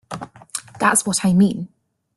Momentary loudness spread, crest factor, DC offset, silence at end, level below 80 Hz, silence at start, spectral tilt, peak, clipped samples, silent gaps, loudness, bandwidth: 18 LU; 18 dB; under 0.1%; 0.5 s; -58 dBFS; 0.1 s; -4.5 dB/octave; -2 dBFS; under 0.1%; none; -17 LUFS; 12.5 kHz